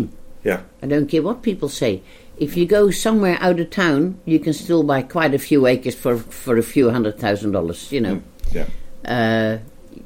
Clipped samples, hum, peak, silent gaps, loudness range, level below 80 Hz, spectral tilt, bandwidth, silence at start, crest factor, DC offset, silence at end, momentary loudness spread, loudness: under 0.1%; none; -4 dBFS; none; 3 LU; -36 dBFS; -6 dB/octave; 16.5 kHz; 0 s; 14 dB; under 0.1%; 0 s; 12 LU; -19 LUFS